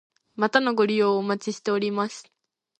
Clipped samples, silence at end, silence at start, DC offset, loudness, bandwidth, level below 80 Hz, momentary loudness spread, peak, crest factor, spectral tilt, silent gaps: under 0.1%; 0.6 s; 0.4 s; under 0.1%; -24 LUFS; 9.2 kHz; -76 dBFS; 10 LU; -4 dBFS; 22 dB; -5 dB/octave; none